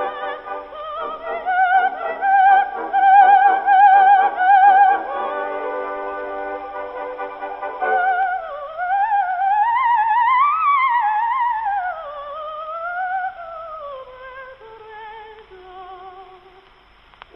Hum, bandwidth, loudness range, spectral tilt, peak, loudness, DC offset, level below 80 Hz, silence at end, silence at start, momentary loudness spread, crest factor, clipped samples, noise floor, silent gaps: none; 4.1 kHz; 16 LU; -5 dB/octave; -2 dBFS; -17 LUFS; under 0.1%; -58 dBFS; 1 s; 0 s; 21 LU; 16 dB; under 0.1%; -50 dBFS; none